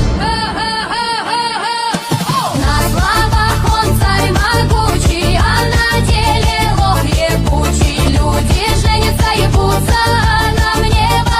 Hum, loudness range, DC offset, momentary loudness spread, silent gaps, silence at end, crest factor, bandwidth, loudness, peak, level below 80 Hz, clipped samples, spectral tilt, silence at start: none; 2 LU; under 0.1%; 4 LU; none; 0 s; 12 dB; 16.5 kHz; -13 LUFS; 0 dBFS; -18 dBFS; under 0.1%; -4.5 dB/octave; 0 s